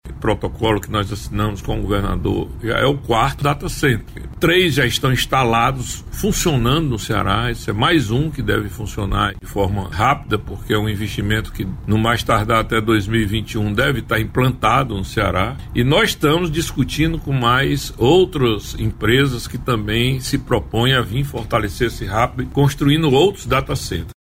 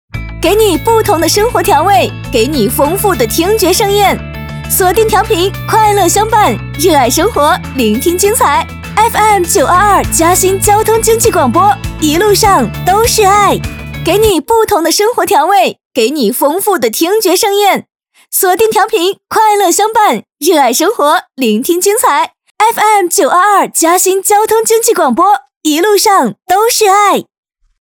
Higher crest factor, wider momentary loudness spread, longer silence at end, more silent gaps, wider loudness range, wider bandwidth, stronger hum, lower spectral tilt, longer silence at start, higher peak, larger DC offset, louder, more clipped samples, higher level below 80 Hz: about the same, 14 dB vs 10 dB; about the same, 7 LU vs 5 LU; second, 0.1 s vs 0.6 s; second, none vs 15.85-15.91 s, 22.51-22.55 s, 25.56-25.61 s; about the same, 3 LU vs 2 LU; second, 16 kHz vs over 20 kHz; neither; first, -5.5 dB/octave vs -3.5 dB/octave; about the same, 0.05 s vs 0.15 s; second, -4 dBFS vs 0 dBFS; neither; second, -18 LUFS vs -9 LUFS; second, under 0.1% vs 0.2%; about the same, -32 dBFS vs -32 dBFS